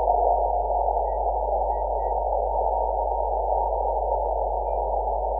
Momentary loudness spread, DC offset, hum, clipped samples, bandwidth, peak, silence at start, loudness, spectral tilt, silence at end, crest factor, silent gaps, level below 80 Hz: 3 LU; under 0.1%; none; under 0.1%; 2 kHz; -8 dBFS; 0 s; -25 LUFS; -13.5 dB/octave; 0 s; 14 dB; none; -32 dBFS